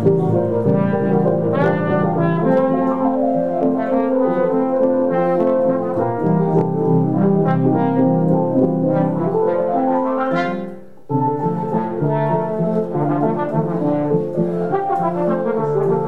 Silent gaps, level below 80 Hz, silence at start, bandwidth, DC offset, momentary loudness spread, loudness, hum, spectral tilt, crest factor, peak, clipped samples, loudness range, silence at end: none; -54 dBFS; 0 s; 5.2 kHz; 1%; 4 LU; -18 LUFS; none; -10.5 dB/octave; 14 dB; -4 dBFS; under 0.1%; 3 LU; 0 s